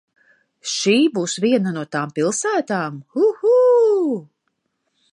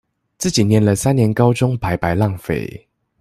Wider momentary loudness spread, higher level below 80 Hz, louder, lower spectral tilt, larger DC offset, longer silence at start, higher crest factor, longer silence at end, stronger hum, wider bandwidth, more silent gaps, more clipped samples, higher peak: about the same, 11 LU vs 9 LU; second, -74 dBFS vs -42 dBFS; about the same, -18 LUFS vs -17 LUFS; second, -4.5 dB/octave vs -6 dB/octave; neither; first, 0.65 s vs 0.4 s; about the same, 16 dB vs 16 dB; first, 0.9 s vs 0.45 s; neither; second, 11 kHz vs 14.5 kHz; neither; neither; about the same, -4 dBFS vs -2 dBFS